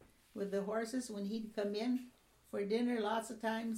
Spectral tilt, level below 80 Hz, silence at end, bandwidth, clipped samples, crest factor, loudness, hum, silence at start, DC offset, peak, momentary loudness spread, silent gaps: -5 dB/octave; -76 dBFS; 0 s; 15.5 kHz; under 0.1%; 14 dB; -39 LUFS; none; 0.35 s; under 0.1%; -24 dBFS; 9 LU; none